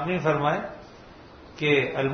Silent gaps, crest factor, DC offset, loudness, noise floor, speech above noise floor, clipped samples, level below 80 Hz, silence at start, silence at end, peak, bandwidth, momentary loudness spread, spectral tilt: none; 18 dB; under 0.1%; -24 LUFS; -47 dBFS; 23 dB; under 0.1%; -56 dBFS; 0 s; 0 s; -10 dBFS; 6.6 kHz; 20 LU; -6.5 dB/octave